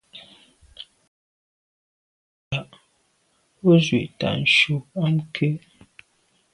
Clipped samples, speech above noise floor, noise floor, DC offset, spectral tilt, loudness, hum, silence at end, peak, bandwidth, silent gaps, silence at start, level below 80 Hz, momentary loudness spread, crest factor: under 0.1%; 46 dB; -66 dBFS; under 0.1%; -6 dB/octave; -21 LUFS; none; 0.95 s; -4 dBFS; 11 kHz; 1.08-2.51 s; 0.15 s; -58 dBFS; 25 LU; 22 dB